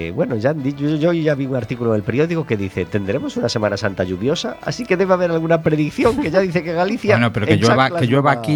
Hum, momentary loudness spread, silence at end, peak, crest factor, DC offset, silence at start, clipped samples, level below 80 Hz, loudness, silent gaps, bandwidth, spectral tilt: none; 6 LU; 0 s; 0 dBFS; 18 dB; under 0.1%; 0 s; under 0.1%; -48 dBFS; -18 LUFS; none; 19 kHz; -6.5 dB/octave